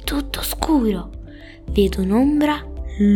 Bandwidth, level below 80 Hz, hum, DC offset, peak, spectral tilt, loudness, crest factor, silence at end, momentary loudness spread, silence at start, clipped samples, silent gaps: 19 kHz; -30 dBFS; none; under 0.1%; -2 dBFS; -5.5 dB/octave; -20 LUFS; 16 dB; 0 s; 19 LU; 0 s; under 0.1%; none